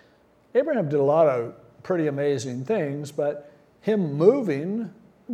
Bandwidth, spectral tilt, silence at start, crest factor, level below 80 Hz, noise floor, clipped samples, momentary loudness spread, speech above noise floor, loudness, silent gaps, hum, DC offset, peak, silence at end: 11.5 kHz; -7.5 dB/octave; 0.55 s; 20 dB; -72 dBFS; -58 dBFS; under 0.1%; 13 LU; 36 dB; -24 LUFS; none; none; under 0.1%; -4 dBFS; 0 s